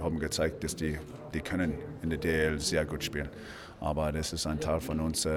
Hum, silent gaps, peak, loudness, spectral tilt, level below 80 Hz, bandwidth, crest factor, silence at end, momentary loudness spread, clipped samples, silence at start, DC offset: none; none; -16 dBFS; -32 LUFS; -4.5 dB/octave; -44 dBFS; 19 kHz; 16 dB; 0 s; 9 LU; under 0.1%; 0 s; under 0.1%